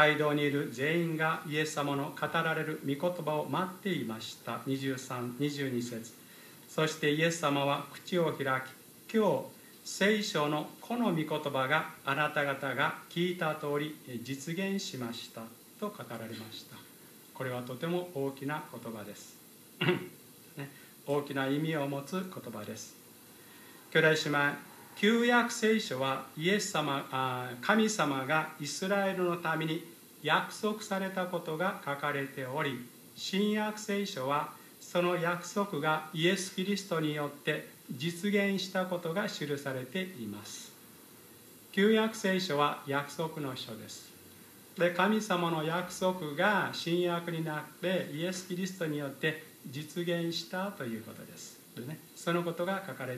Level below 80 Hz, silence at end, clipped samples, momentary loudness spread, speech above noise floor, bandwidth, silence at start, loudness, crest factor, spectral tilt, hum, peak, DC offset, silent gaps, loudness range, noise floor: -82 dBFS; 0 s; under 0.1%; 18 LU; 22 dB; 15 kHz; 0 s; -33 LUFS; 24 dB; -4.5 dB/octave; none; -10 dBFS; under 0.1%; none; 7 LU; -55 dBFS